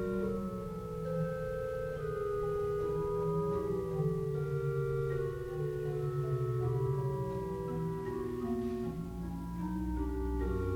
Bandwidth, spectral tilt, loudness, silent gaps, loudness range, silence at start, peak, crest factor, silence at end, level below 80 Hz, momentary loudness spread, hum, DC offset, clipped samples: 18.5 kHz; -9 dB/octave; -36 LUFS; none; 3 LU; 0 s; -22 dBFS; 12 dB; 0 s; -46 dBFS; 5 LU; none; under 0.1%; under 0.1%